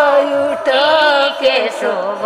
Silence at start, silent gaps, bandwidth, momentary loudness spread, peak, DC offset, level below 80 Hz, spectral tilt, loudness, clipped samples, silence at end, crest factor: 0 s; none; 12.5 kHz; 7 LU; 0 dBFS; under 0.1%; -60 dBFS; -2.5 dB/octave; -13 LUFS; under 0.1%; 0 s; 14 dB